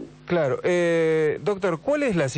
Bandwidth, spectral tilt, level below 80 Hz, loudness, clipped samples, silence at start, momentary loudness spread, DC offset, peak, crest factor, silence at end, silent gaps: 9 kHz; -6 dB/octave; -56 dBFS; -23 LUFS; under 0.1%; 0 s; 4 LU; under 0.1%; -14 dBFS; 10 dB; 0 s; none